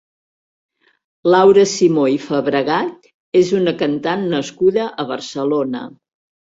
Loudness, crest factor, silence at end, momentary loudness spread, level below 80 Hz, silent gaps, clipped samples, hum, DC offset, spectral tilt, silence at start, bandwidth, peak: -16 LUFS; 16 dB; 0.6 s; 12 LU; -60 dBFS; 3.14-3.32 s; under 0.1%; none; under 0.1%; -5.5 dB/octave; 1.25 s; 7.8 kHz; -2 dBFS